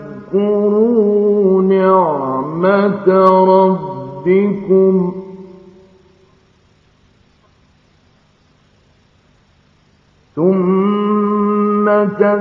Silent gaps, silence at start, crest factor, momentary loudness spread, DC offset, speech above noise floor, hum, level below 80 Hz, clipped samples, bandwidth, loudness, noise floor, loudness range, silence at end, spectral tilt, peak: none; 0 s; 14 dB; 10 LU; under 0.1%; 42 dB; none; -58 dBFS; under 0.1%; 4.7 kHz; -13 LUFS; -53 dBFS; 8 LU; 0 s; -10.5 dB/octave; 0 dBFS